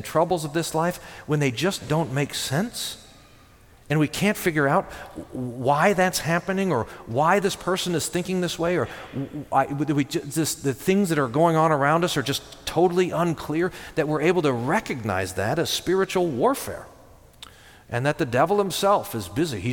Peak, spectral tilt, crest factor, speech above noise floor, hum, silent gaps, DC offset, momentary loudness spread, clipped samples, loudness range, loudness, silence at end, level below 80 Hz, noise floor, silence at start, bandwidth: -6 dBFS; -5 dB/octave; 18 dB; 28 dB; none; none; under 0.1%; 9 LU; under 0.1%; 4 LU; -24 LUFS; 0 s; -52 dBFS; -52 dBFS; 0 s; 19 kHz